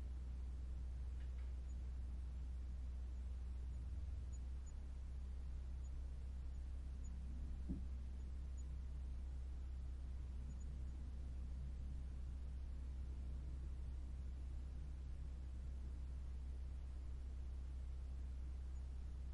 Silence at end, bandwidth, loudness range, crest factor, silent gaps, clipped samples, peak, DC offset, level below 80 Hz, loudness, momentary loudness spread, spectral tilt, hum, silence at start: 0 s; 10.5 kHz; 1 LU; 14 dB; none; under 0.1%; -34 dBFS; under 0.1%; -48 dBFS; -51 LUFS; 2 LU; -7.5 dB/octave; none; 0 s